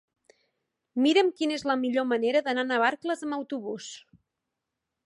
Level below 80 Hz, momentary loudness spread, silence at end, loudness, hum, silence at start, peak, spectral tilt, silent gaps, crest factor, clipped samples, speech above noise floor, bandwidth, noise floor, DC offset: -76 dBFS; 14 LU; 1.05 s; -27 LUFS; none; 0.95 s; -10 dBFS; -3.5 dB/octave; none; 18 dB; under 0.1%; 59 dB; 11.5 kHz; -85 dBFS; under 0.1%